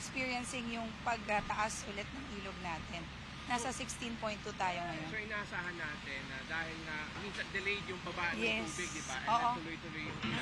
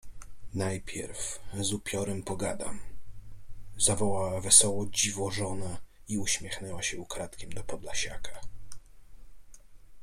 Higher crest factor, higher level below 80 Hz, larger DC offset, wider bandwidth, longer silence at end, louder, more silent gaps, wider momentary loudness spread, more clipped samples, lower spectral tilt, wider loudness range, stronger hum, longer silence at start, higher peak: second, 20 dB vs 26 dB; second, -56 dBFS vs -48 dBFS; neither; second, 13.5 kHz vs 16 kHz; about the same, 0 s vs 0 s; second, -39 LUFS vs -29 LUFS; neither; second, 8 LU vs 17 LU; neither; about the same, -3.5 dB/octave vs -2.5 dB/octave; second, 3 LU vs 10 LU; neither; about the same, 0 s vs 0.05 s; second, -20 dBFS vs -6 dBFS